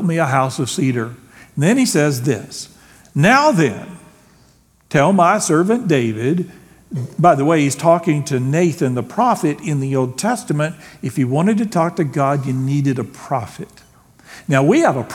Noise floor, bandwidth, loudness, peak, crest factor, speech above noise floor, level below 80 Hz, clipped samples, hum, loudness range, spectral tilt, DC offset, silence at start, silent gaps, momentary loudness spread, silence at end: -53 dBFS; 17 kHz; -17 LUFS; 0 dBFS; 18 dB; 37 dB; -58 dBFS; under 0.1%; none; 3 LU; -6 dB/octave; under 0.1%; 0 s; none; 15 LU; 0 s